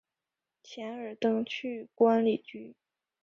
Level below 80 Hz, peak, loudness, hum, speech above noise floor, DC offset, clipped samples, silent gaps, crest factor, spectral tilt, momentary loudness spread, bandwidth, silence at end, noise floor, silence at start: -78 dBFS; -12 dBFS; -30 LUFS; none; 60 dB; under 0.1%; under 0.1%; none; 20 dB; -6.5 dB/octave; 22 LU; 7 kHz; 0.5 s; -89 dBFS; 0.65 s